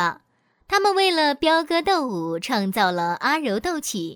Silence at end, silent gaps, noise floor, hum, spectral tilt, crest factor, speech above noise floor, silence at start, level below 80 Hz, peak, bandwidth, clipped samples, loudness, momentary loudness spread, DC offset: 0 s; none; -64 dBFS; none; -3.5 dB/octave; 16 dB; 43 dB; 0 s; -56 dBFS; -6 dBFS; over 20 kHz; under 0.1%; -21 LUFS; 8 LU; under 0.1%